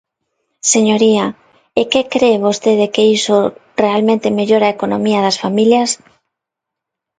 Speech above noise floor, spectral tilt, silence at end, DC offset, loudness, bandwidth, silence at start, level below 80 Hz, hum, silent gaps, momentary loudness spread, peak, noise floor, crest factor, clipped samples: 68 dB; -4 dB/octave; 1.25 s; under 0.1%; -14 LUFS; 9.6 kHz; 0.65 s; -58 dBFS; none; none; 7 LU; 0 dBFS; -81 dBFS; 14 dB; under 0.1%